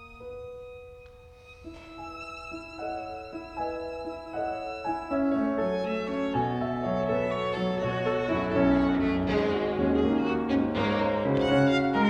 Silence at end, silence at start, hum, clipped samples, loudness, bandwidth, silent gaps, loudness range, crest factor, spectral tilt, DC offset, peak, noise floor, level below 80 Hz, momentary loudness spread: 0 s; 0 s; none; under 0.1%; -28 LUFS; 8.6 kHz; none; 13 LU; 16 dB; -7.5 dB/octave; under 0.1%; -12 dBFS; -50 dBFS; -48 dBFS; 18 LU